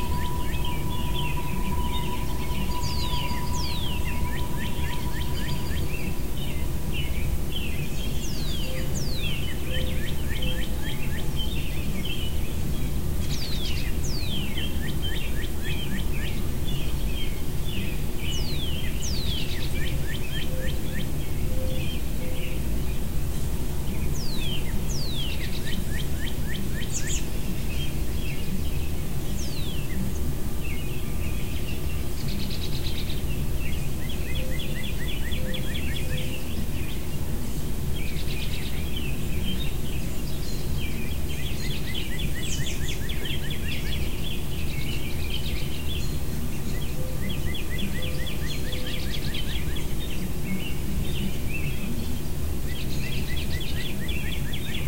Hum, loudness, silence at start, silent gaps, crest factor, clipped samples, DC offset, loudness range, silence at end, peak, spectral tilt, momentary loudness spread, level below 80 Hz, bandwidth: none; -30 LUFS; 0 s; none; 14 dB; under 0.1%; 5%; 2 LU; 0 s; -12 dBFS; -4.5 dB/octave; 3 LU; -30 dBFS; 16 kHz